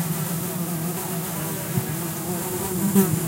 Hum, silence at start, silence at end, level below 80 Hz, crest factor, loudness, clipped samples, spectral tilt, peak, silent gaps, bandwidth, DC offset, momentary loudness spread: none; 0 s; 0 s; -54 dBFS; 18 dB; -25 LUFS; under 0.1%; -5 dB/octave; -6 dBFS; none; 16 kHz; under 0.1%; 7 LU